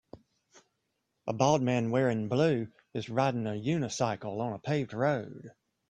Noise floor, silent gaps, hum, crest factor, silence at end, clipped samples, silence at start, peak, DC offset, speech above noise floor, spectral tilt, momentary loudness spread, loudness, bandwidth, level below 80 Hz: -81 dBFS; none; none; 22 dB; 0.4 s; under 0.1%; 0.15 s; -10 dBFS; under 0.1%; 51 dB; -6 dB/octave; 12 LU; -30 LUFS; 9.8 kHz; -68 dBFS